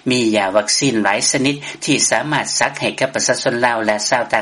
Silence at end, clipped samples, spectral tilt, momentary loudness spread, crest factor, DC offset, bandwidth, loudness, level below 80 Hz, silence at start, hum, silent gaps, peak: 0 s; under 0.1%; -2.5 dB/octave; 4 LU; 16 dB; under 0.1%; 11.5 kHz; -16 LUFS; -56 dBFS; 0.05 s; none; none; 0 dBFS